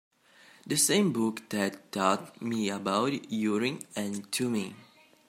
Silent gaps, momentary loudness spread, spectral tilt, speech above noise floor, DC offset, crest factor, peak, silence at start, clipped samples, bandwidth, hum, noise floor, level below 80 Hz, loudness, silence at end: none; 10 LU; -3.5 dB/octave; 29 dB; under 0.1%; 20 dB; -10 dBFS; 0.65 s; under 0.1%; 16 kHz; none; -58 dBFS; -76 dBFS; -29 LUFS; 0.45 s